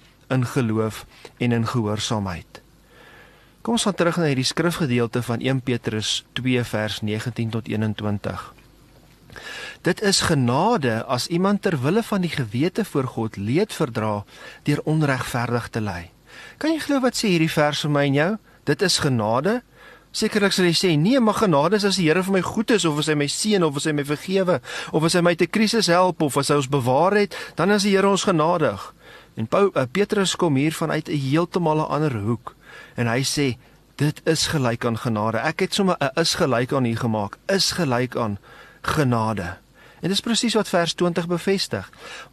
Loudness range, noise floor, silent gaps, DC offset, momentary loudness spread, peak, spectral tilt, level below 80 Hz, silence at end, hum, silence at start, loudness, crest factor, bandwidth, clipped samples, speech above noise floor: 5 LU; -51 dBFS; none; under 0.1%; 10 LU; -4 dBFS; -5 dB/octave; -52 dBFS; 0.05 s; none; 0.3 s; -21 LUFS; 16 dB; 13 kHz; under 0.1%; 30 dB